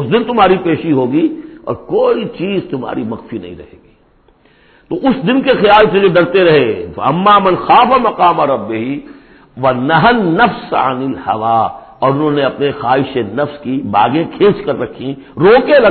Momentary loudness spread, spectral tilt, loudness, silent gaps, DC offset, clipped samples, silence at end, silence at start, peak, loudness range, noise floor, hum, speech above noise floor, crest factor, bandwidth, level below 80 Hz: 13 LU; -9.5 dB/octave; -12 LUFS; none; under 0.1%; under 0.1%; 0 s; 0 s; 0 dBFS; 9 LU; -50 dBFS; none; 38 dB; 12 dB; 4.6 kHz; -44 dBFS